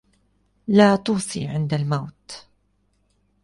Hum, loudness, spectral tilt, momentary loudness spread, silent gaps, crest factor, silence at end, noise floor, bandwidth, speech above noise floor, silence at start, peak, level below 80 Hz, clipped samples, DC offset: 50 Hz at -45 dBFS; -21 LUFS; -6 dB/octave; 24 LU; none; 20 dB; 1.05 s; -66 dBFS; 11.5 kHz; 46 dB; 0.7 s; -4 dBFS; -56 dBFS; under 0.1%; under 0.1%